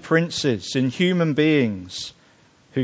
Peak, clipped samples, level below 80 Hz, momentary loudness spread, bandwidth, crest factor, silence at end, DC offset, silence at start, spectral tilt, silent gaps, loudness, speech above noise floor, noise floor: -4 dBFS; under 0.1%; -56 dBFS; 13 LU; 8 kHz; 18 dB; 0 s; under 0.1%; 0.05 s; -5.5 dB/octave; none; -21 LUFS; 35 dB; -55 dBFS